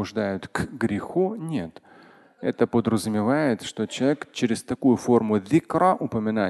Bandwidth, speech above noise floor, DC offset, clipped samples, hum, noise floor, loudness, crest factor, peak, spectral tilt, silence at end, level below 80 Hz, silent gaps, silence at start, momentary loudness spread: 12.5 kHz; 28 dB; under 0.1%; under 0.1%; none; -52 dBFS; -24 LUFS; 18 dB; -6 dBFS; -6 dB/octave; 0 s; -54 dBFS; none; 0 s; 9 LU